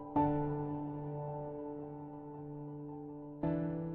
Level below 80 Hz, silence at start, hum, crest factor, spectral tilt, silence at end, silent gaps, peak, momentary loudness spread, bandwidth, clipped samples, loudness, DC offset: -60 dBFS; 0 s; none; 18 dB; -10 dB/octave; 0 s; none; -20 dBFS; 14 LU; 3.8 kHz; under 0.1%; -40 LUFS; under 0.1%